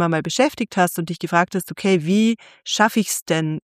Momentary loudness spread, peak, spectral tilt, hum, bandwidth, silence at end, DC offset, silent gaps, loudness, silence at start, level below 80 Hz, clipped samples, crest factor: 6 LU; -2 dBFS; -4.5 dB/octave; none; 15.5 kHz; 0.05 s; under 0.1%; 3.22-3.26 s; -20 LUFS; 0 s; -64 dBFS; under 0.1%; 18 dB